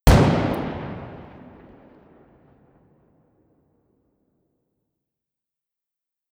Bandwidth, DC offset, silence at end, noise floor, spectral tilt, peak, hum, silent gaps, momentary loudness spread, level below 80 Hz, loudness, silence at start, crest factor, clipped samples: 16.5 kHz; under 0.1%; 5.1 s; -87 dBFS; -6.5 dB/octave; -2 dBFS; none; none; 28 LU; -32 dBFS; -22 LUFS; 0.05 s; 24 dB; under 0.1%